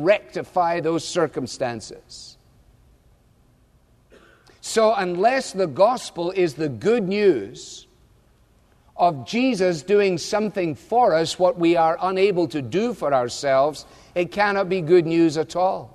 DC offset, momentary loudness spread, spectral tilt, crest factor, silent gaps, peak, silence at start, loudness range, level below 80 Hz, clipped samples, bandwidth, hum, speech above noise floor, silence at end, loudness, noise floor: under 0.1%; 10 LU; -5 dB/octave; 16 dB; none; -6 dBFS; 0 s; 8 LU; -58 dBFS; under 0.1%; 13 kHz; none; 37 dB; 0.1 s; -21 LUFS; -57 dBFS